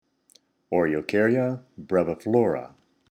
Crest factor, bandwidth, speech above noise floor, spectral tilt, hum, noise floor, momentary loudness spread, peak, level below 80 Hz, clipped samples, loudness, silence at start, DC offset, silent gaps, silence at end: 18 dB; 14 kHz; 38 dB; -8 dB/octave; none; -62 dBFS; 7 LU; -8 dBFS; -62 dBFS; under 0.1%; -24 LUFS; 0.7 s; under 0.1%; none; 0.45 s